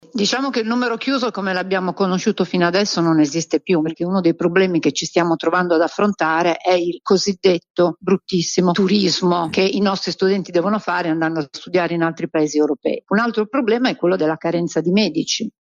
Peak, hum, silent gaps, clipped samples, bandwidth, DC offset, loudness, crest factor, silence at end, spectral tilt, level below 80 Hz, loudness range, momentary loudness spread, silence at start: -2 dBFS; none; 7.70-7.74 s; under 0.1%; 7.6 kHz; under 0.1%; -18 LUFS; 16 dB; 0.1 s; -5 dB/octave; -62 dBFS; 2 LU; 4 LU; 0.15 s